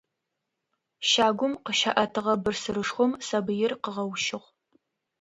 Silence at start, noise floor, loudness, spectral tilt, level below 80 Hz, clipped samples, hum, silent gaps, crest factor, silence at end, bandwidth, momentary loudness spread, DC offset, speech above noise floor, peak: 1 s; -83 dBFS; -26 LUFS; -3 dB/octave; -64 dBFS; under 0.1%; none; none; 22 dB; 0.85 s; 10.5 kHz; 8 LU; under 0.1%; 56 dB; -6 dBFS